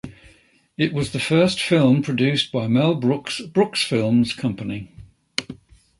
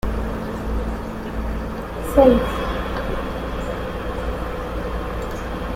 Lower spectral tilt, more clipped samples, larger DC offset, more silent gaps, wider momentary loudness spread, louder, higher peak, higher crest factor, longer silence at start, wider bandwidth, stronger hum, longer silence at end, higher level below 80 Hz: second, -5.5 dB/octave vs -7 dB/octave; neither; neither; neither; about the same, 12 LU vs 13 LU; first, -20 LUFS vs -23 LUFS; about the same, -2 dBFS vs -2 dBFS; about the same, 20 dB vs 20 dB; about the same, 0.05 s vs 0.05 s; second, 11.5 kHz vs 16 kHz; neither; first, 0.45 s vs 0 s; second, -54 dBFS vs -28 dBFS